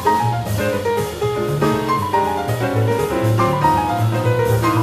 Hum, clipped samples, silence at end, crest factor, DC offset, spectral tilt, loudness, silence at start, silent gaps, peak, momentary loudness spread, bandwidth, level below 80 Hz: none; under 0.1%; 0 s; 14 dB; under 0.1%; -6.5 dB/octave; -18 LUFS; 0 s; none; -4 dBFS; 4 LU; 15 kHz; -40 dBFS